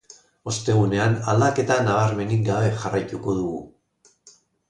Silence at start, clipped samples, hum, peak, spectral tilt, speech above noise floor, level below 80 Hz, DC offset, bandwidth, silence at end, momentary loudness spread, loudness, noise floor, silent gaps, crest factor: 0.45 s; under 0.1%; none; -6 dBFS; -6 dB/octave; 40 dB; -52 dBFS; under 0.1%; 10 kHz; 1 s; 9 LU; -22 LUFS; -61 dBFS; none; 16 dB